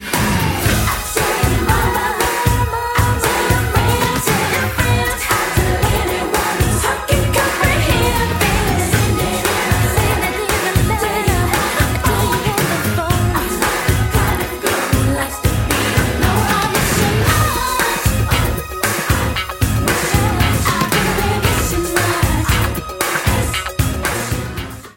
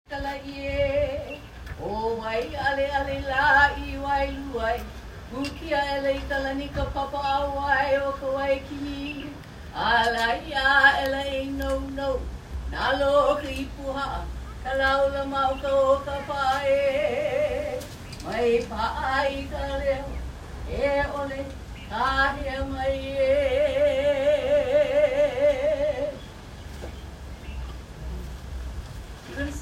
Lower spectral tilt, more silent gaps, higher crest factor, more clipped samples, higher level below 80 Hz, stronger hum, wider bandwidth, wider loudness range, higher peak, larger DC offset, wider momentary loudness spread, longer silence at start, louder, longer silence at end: about the same, -4 dB/octave vs -5 dB/octave; neither; second, 16 dB vs 22 dB; neither; first, -24 dBFS vs -38 dBFS; neither; about the same, 17 kHz vs 15.5 kHz; second, 1 LU vs 5 LU; first, 0 dBFS vs -4 dBFS; neither; second, 3 LU vs 16 LU; about the same, 0 s vs 0.1 s; first, -16 LUFS vs -25 LUFS; about the same, 0.05 s vs 0 s